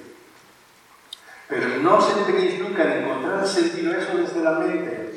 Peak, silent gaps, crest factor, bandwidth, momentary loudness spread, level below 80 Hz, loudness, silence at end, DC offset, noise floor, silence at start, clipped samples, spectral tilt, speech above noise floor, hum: -4 dBFS; none; 20 dB; 12 kHz; 13 LU; -76 dBFS; -21 LUFS; 0 s; under 0.1%; -52 dBFS; 0 s; under 0.1%; -4.5 dB/octave; 31 dB; none